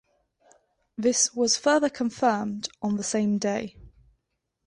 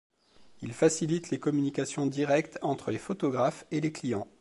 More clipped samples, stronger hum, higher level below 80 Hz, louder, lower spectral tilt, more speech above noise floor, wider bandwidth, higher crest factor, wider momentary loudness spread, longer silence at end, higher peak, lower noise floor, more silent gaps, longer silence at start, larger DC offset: neither; neither; first, -62 dBFS vs -68 dBFS; first, -25 LUFS vs -30 LUFS; second, -3 dB/octave vs -5.5 dB/octave; first, 54 dB vs 29 dB; about the same, 11 kHz vs 11.5 kHz; about the same, 18 dB vs 20 dB; first, 11 LU vs 7 LU; first, 0.8 s vs 0.15 s; first, -8 dBFS vs -12 dBFS; first, -79 dBFS vs -58 dBFS; neither; first, 1 s vs 0.4 s; neither